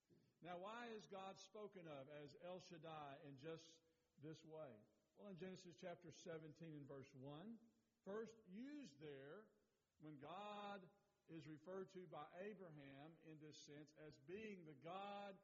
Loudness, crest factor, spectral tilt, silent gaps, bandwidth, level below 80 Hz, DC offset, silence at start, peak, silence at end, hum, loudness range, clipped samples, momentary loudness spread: -59 LUFS; 18 dB; -4.5 dB/octave; none; 7.4 kHz; under -90 dBFS; under 0.1%; 0.1 s; -42 dBFS; 0 s; none; 2 LU; under 0.1%; 9 LU